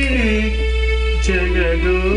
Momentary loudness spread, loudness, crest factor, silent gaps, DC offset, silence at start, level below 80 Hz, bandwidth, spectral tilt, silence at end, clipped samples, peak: 2 LU; -17 LUFS; 10 dB; none; under 0.1%; 0 s; -18 dBFS; 10 kHz; -6 dB/octave; 0 s; under 0.1%; -6 dBFS